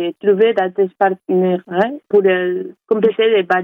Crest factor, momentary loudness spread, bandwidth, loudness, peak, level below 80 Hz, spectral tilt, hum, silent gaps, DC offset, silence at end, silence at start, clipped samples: 12 dB; 5 LU; 4.6 kHz; -16 LUFS; -4 dBFS; -66 dBFS; -8 dB/octave; none; none; under 0.1%; 0 s; 0 s; under 0.1%